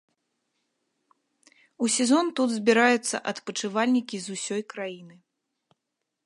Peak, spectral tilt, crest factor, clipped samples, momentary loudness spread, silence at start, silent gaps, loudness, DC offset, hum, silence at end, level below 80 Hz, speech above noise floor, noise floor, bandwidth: -6 dBFS; -3 dB/octave; 22 dB; under 0.1%; 14 LU; 1.8 s; none; -25 LUFS; under 0.1%; none; 1.15 s; -80 dBFS; 58 dB; -83 dBFS; 11.5 kHz